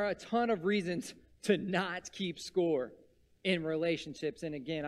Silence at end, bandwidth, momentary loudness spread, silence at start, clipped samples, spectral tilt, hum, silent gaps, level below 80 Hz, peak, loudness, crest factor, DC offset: 0 s; 13.5 kHz; 9 LU; 0 s; under 0.1%; -5 dB/octave; none; none; -68 dBFS; -14 dBFS; -34 LUFS; 20 dB; under 0.1%